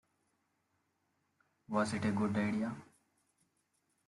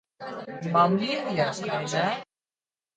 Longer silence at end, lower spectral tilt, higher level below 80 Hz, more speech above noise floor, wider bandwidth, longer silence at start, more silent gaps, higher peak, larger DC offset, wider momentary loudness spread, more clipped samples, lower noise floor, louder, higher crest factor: first, 1.25 s vs 0.75 s; first, -6.5 dB/octave vs -5 dB/octave; second, -76 dBFS vs -70 dBFS; second, 46 dB vs over 64 dB; first, 11.5 kHz vs 9.4 kHz; first, 1.7 s vs 0.2 s; neither; second, -20 dBFS vs -8 dBFS; neither; second, 7 LU vs 15 LU; neither; second, -80 dBFS vs under -90 dBFS; second, -36 LUFS vs -26 LUFS; about the same, 20 dB vs 20 dB